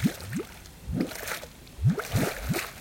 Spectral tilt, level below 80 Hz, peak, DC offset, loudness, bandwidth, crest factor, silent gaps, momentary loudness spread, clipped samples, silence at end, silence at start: -5.5 dB/octave; -44 dBFS; -12 dBFS; under 0.1%; -31 LUFS; 17 kHz; 18 dB; none; 13 LU; under 0.1%; 0 s; 0 s